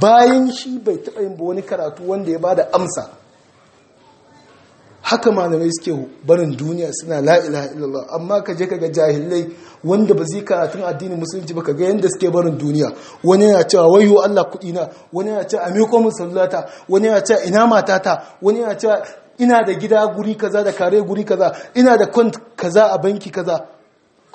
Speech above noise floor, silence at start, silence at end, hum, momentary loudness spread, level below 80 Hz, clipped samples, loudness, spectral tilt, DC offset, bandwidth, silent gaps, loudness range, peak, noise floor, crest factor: 39 dB; 0 s; 0.7 s; none; 12 LU; -64 dBFS; under 0.1%; -16 LUFS; -5.5 dB/octave; under 0.1%; 8.8 kHz; none; 7 LU; 0 dBFS; -55 dBFS; 16 dB